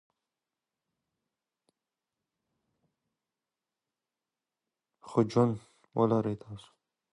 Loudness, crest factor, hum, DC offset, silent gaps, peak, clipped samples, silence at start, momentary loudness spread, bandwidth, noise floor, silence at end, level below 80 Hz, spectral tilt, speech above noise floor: -30 LUFS; 24 dB; none; under 0.1%; none; -12 dBFS; under 0.1%; 5.05 s; 17 LU; 11 kHz; under -90 dBFS; 0.6 s; -70 dBFS; -8.5 dB/octave; over 61 dB